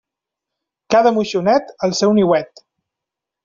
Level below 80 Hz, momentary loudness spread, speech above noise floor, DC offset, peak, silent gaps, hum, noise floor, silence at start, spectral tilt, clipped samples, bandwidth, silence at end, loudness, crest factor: -58 dBFS; 6 LU; 69 dB; under 0.1%; 0 dBFS; none; none; -84 dBFS; 0.9 s; -5 dB/octave; under 0.1%; 7.6 kHz; 1 s; -16 LUFS; 18 dB